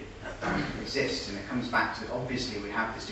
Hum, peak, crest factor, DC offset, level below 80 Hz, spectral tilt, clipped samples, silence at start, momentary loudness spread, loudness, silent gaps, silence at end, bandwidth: none; -14 dBFS; 20 dB; under 0.1%; -50 dBFS; -4.5 dB/octave; under 0.1%; 0 s; 6 LU; -32 LUFS; none; 0 s; 12.5 kHz